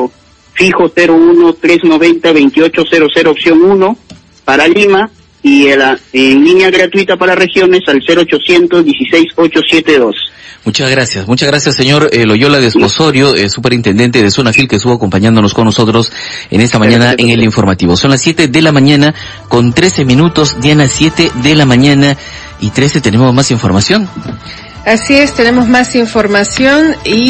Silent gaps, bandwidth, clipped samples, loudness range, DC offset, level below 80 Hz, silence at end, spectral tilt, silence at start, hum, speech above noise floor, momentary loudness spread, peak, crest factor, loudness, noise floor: none; 11 kHz; 2%; 2 LU; under 0.1%; -36 dBFS; 0 s; -5 dB/octave; 0 s; none; 28 dB; 7 LU; 0 dBFS; 8 dB; -7 LUFS; -35 dBFS